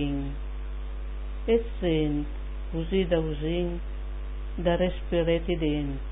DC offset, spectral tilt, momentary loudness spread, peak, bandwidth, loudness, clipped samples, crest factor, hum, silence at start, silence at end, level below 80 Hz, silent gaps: under 0.1%; -11 dB/octave; 12 LU; -12 dBFS; 3.9 kHz; -29 LUFS; under 0.1%; 16 dB; none; 0 s; 0 s; -34 dBFS; none